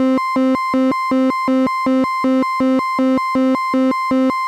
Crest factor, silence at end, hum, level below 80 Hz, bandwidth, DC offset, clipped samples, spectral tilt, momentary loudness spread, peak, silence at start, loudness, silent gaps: 6 dB; 0 s; none; -56 dBFS; 12 kHz; under 0.1%; under 0.1%; -5.5 dB/octave; 0 LU; -8 dBFS; 0 s; -16 LUFS; none